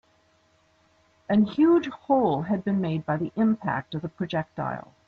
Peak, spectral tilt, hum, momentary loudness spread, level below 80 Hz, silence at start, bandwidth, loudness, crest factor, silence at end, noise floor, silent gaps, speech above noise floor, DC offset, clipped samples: -10 dBFS; -9 dB/octave; none; 11 LU; -62 dBFS; 1.3 s; 6.4 kHz; -25 LUFS; 16 dB; 0.25 s; -64 dBFS; none; 39 dB; under 0.1%; under 0.1%